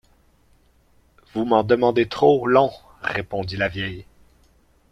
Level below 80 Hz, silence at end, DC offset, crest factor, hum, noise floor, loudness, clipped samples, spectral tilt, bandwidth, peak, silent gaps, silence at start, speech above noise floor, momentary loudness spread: -52 dBFS; 0.9 s; under 0.1%; 20 dB; none; -58 dBFS; -21 LUFS; under 0.1%; -7 dB/octave; 10.5 kHz; -2 dBFS; none; 1.35 s; 38 dB; 13 LU